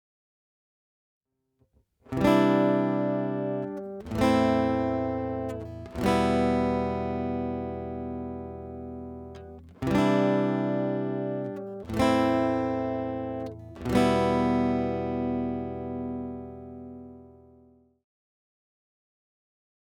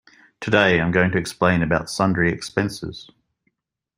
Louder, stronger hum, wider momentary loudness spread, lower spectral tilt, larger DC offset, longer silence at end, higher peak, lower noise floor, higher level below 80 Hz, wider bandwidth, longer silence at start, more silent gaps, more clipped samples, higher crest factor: second, -27 LUFS vs -20 LUFS; neither; about the same, 16 LU vs 16 LU; first, -7 dB/octave vs -5.5 dB/octave; neither; first, 2.65 s vs 0.95 s; second, -10 dBFS vs -2 dBFS; about the same, -71 dBFS vs -72 dBFS; about the same, -52 dBFS vs -48 dBFS; about the same, 17 kHz vs 15.5 kHz; first, 2.1 s vs 0.4 s; neither; neither; about the same, 20 dB vs 20 dB